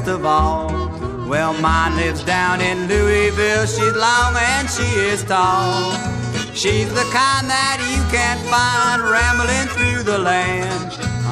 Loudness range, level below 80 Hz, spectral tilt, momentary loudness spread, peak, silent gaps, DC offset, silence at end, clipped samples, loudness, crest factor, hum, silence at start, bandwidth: 1 LU; -30 dBFS; -4 dB/octave; 7 LU; -2 dBFS; none; under 0.1%; 0 s; under 0.1%; -17 LUFS; 16 dB; none; 0 s; 13.5 kHz